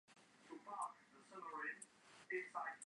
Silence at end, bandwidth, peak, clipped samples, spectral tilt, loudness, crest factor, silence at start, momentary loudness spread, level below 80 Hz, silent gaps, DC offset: 0.05 s; 11 kHz; -34 dBFS; under 0.1%; -2.5 dB/octave; -50 LUFS; 18 dB; 0.1 s; 18 LU; under -90 dBFS; none; under 0.1%